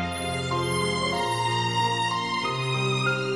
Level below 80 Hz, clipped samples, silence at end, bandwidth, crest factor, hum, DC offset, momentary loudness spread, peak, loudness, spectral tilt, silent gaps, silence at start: -58 dBFS; under 0.1%; 0 s; 11.5 kHz; 12 dB; none; under 0.1%; 3 LU; -12 dBFS; -25 LUFS; -4 dB/octave; none; 0 s